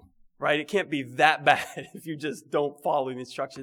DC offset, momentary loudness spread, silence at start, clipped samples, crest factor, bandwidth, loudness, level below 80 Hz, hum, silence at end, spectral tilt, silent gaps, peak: under 0.1%; 13 LU; 0.4 s; under 0.1%; 22 dB; 18 kHz; -26 LUFS; -70 dBFS; none; 0 s; -4.5 dB/octave; none; -4 dBFS